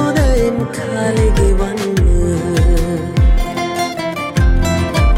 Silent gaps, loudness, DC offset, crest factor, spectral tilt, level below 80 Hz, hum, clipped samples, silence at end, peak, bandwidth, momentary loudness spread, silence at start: none; -16 LUFS; under 0.1%; 10 dB; -6 dB/octave; -16 dBFS; none; under 0.1%; 0 s; -4 dBFS; 15.5 kHz; 5 LU; 0 s